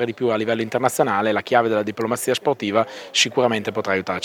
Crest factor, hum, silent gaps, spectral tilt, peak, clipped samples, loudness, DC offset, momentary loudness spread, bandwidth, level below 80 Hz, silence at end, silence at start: 18 dB; none; none; -3.5 dB/octave; -2 dBFS; under 0.1%; -21 LUFS; under 0.1%; 4 LU; 19 kHz; -66 dBFS; 0 s; 0 s